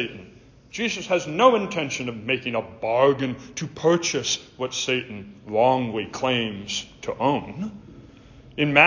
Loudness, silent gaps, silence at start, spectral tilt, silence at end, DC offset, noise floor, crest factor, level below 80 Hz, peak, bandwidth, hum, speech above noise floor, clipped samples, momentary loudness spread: -24 LUFS; none; 0 s; -4 dB/octave; 0 s; under 0.1%; -47 dBFS; 22 dB; -56 dBFS; -2 dBFS; 7.6 kHz; none; 24 dB; under 0.1%; 14 LU